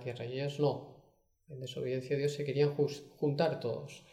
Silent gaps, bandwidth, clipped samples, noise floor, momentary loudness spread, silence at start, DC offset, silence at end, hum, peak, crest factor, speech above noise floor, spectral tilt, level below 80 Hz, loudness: none; 13 kHz; under 0.1%; -68 dBFS; 12 LU; 0 s; under 0.1%; 0.1 s; none; -18 dBFS; 18 dB; 33 dB; -6.5 dB/octave; -74 dBFS; -35 LUFS